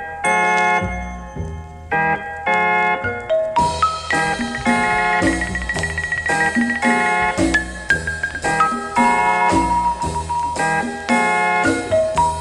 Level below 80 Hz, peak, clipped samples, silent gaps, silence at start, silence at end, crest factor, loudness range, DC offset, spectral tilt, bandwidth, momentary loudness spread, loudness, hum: -36 dBFS; 0 dBFS; under 0.1%; none; 0 s; 0 s; 18 dB; 2 LU; under 0.1%; -4.5 dB/octave; 12 kHz; 7 LU; -18 LUFS; none